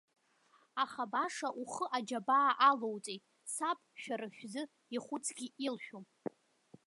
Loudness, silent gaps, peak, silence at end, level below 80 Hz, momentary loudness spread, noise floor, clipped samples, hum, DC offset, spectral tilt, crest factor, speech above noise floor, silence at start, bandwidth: -36 LUFS; none; -16 dBFS; 0.8 s; under -90 dBFS; 17 LU; -71 dBFS; under 0.1%; none; under 0.1%; -2.5 dB/octave; 22 dB; 34 dB; 0.75 s; 11.5 kHz